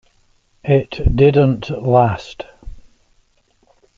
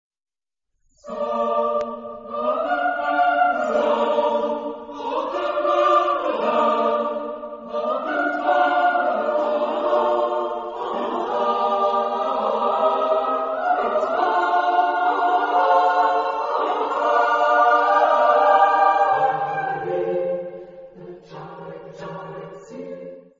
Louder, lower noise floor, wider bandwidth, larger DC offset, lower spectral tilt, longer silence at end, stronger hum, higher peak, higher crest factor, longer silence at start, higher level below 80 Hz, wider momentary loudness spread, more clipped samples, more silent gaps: first, -15 LUFS vs -20 LUFS; second, -59 dBFS vs -79 dBFS; about the same, 7.2 kHz vs 7.6 kHz; neither; first, -8.5 dB/octave vs -5 dB/octave; first, 1.15 s vs 0.2 s; neither; about the same, -2 dBFS vs -4 dBFS; about the same, 16 dB vs 16 dB; second, 0.65 s vs 1.05 s; first, -30 dBFS vs -64 dBFS; about the same, 20 LU vs 18 LU; neither; neither